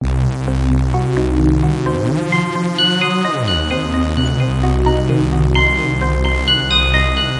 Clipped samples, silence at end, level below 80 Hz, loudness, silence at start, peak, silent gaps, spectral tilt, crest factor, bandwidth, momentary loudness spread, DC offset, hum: under 0.1%; 0 s; -22 dBFS; -16 LUFS; 0 s; -2 dBFS; none; -6 dB/octave; 14 dB; 11.5 kHz; 5 LU; under 0.1%; none